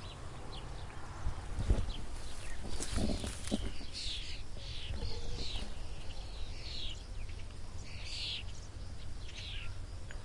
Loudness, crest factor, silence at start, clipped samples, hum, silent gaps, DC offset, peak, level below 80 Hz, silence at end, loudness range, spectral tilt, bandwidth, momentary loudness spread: -43 LUFS; 20 dB; 0 s; under 0.1%; none; none; under 0.1%; -16 dBFS; -42 dBFS; 0 s; 4 LU; -4 dB/octave; 11.5 kHz; 11 LU